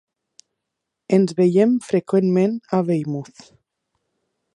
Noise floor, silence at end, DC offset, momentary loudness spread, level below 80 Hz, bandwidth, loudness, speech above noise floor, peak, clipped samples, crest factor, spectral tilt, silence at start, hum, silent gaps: -81 dBFS; 1.35 s; under 0.1%; 10 LU; -70 dBFS; 11 kHz; -19 LUFS; 62 dB; -2 dBFS; under 0.1%; 18 dB; -8 dB/octave; 1.1 s; none; none